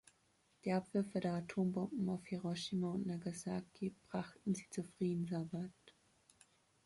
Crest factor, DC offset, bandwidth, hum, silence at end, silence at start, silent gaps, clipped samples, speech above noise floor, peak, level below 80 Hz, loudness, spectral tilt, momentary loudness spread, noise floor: 16 dB; under 0.1%; 11.5 kHz; none; 0.95 s; 0.65 s; none; under 0.1%; 35 dB; -26 dBFS; -74 dBFS; -42 LUFS; -6.5 dB/octave; 7 LU; -76 dBFS